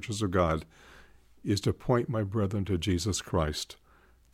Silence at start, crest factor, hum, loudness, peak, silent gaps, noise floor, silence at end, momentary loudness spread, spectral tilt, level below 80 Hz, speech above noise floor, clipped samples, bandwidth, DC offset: 0 s; 18 dB; none; -30 LUFS; -12 dBFS; none; -61 dBFS; 0.6 s; 7 LU; -5.5 dB/octave; -50 dBFS; 31 dB; under 0.1%; 15.5 kHz; under 0.1%